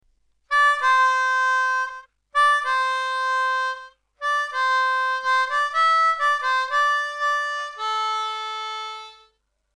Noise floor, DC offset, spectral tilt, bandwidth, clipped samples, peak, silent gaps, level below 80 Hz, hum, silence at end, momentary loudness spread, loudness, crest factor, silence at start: -66 dBFS; under 0.1%; 3.5 dB/octave; 12 kHz; under 0.1%; -10 dBFS; none; -68 dBFS; none; 0.65 s; 11 LU; -21 LUFS; 14 dB; 0.5 s